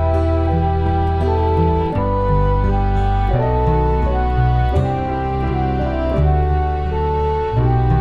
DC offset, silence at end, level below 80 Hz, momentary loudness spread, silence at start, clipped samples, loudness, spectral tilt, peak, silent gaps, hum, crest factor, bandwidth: under 0.1%; 0 s; -20 dBFS; 3 LU; 0 s; under 0.1%; -18 LUFS; -9.5 dB/octave; -4 dBFS; none; none; 12 dB; 5.4 kHz